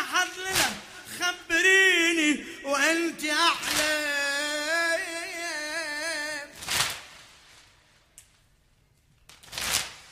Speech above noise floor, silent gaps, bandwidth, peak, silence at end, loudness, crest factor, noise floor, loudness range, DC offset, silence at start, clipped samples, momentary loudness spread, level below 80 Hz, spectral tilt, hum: 38 dB; none; 15.5 kHz; -6 dBFS; 0 s; -25 LUFS; 22 dB; -64 dBFS; 12 LU; under 0.1%; 0 s; under 0.1%; 13 LU; -60 dBFS; -1 dB/octave; none